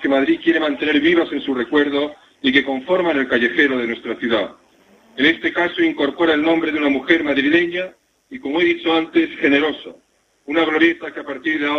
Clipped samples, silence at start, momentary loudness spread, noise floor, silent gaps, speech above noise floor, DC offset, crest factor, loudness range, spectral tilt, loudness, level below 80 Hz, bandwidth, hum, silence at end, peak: under 0.1%; 0 s; 9 LU; -52 dBFS; none; 35 dB; under 0.1%; 18 dB; 2 LU; -5.5 dB/octave; -18 LUFS; -56 dBFS; 6.6 kHz; none; 0 s; 0 dBFS